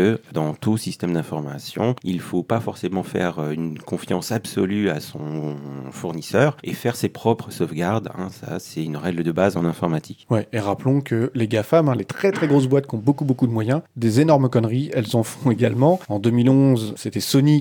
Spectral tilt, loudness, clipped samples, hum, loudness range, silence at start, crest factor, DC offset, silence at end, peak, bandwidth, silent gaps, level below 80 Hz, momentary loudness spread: -7 dB/octave; -21 LUFS; under 0.1%; none; 6 LU; 0 s; 18 dB; under 0.1%; 0 s; -2 dBFS; 20 kHz; none; -62 dBFS; 11 LU